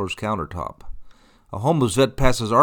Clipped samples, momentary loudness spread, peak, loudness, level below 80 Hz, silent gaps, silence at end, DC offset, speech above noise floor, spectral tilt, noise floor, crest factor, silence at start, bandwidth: under 0.1%; 14 LU; -2 dBFS; -22 LUFS; -34 dBFS; none; 0 s; under 0.1%; 27 dB; -5.5 dB/octave; -46 dBFS; 20 dB; 0 s; 18.5 kHz